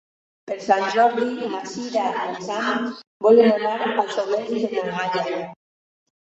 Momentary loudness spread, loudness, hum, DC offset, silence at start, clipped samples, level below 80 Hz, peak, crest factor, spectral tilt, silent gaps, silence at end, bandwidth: 13 LU; -22 LUFS; none; under 0.1%; 0.45 s; under 0.1%; -70 dBFS; -4 dBFS; 18 dB; -4.5 dB/octave; 3.07-3.20 s; 0.75 s; 8 kHz